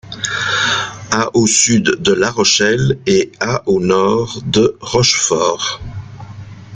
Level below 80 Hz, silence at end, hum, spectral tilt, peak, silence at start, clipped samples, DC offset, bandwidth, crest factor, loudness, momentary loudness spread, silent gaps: -44 dBFS; 0 s; none; -3 dB/octave; 0 dBFS; 0.05 s; under 0.1%; under 0.1%; 9.6 kHz; 14 dB; -14 LUFS; 14 LU; none